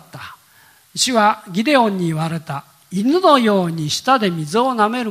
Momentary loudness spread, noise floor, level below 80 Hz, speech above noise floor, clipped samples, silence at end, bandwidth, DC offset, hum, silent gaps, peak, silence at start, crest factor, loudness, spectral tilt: 17 LU; -51 dBFS; -64 dBFS; 34 dB; under 0.1%; 0 s; 16 kHz; under 0.1%; none; none; 0 dBFS; 0.15 s; 18 dB; -17 LUFS; -4.5 dB/octave